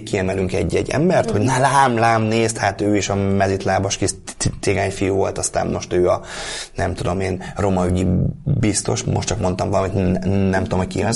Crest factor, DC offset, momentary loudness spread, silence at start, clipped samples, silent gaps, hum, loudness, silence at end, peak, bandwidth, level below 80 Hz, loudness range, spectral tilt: 16 dB; under 0.1%; 6 LU; 0 s; under 0.1%; none; none; -19 LUFS; 0 s; -2 dBFS; 11.5 kHz; -38 dBFS; 4 LU; -5 dB/octave